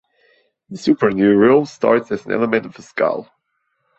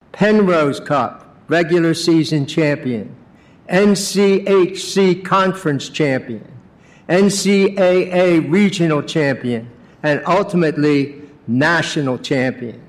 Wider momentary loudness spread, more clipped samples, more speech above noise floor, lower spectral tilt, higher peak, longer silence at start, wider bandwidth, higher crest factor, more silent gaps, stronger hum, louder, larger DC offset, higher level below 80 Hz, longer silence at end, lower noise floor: first, 12 LU vs 9 LU; neither; first, 54 dB vs 29 dB; first, -7 dB/octave vs -5.5 dB/octave; about the same, -2 dBFS vs -4 dBFS; first, 0.7 s vs 0.15 s; second, 8.2 kHz vs 14.5 kHz; about the same, 16 dB vs 12 dB; neither; neither; about the same, -17 LUFS vs -16 LUFS; neither; about the same, -58 dBFS vs -56 dBFS; first, 0.75 s vs 0.1 s; first, -70 dBFS vs -45 dBFS